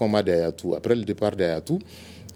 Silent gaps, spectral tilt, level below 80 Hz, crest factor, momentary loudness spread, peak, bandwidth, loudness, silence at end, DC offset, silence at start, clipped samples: none; -6.5 dB/octave; -54 dBFS; 18 dB; 9 LU; -6 dBFS; 18 kHz; -25 LUFS; 0 s; under 0.1%; 0 s; under 0.1%